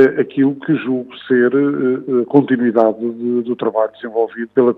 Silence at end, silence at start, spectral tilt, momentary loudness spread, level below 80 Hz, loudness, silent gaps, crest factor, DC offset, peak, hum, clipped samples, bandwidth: 0.05 s; 0 s; -9.5 dB/octave; 7 LU; -70 dBFS; -16 LUFS; none; 16 dB; under 0.1%; 0 dBFS; none; under 0.1%; 4.4 kHz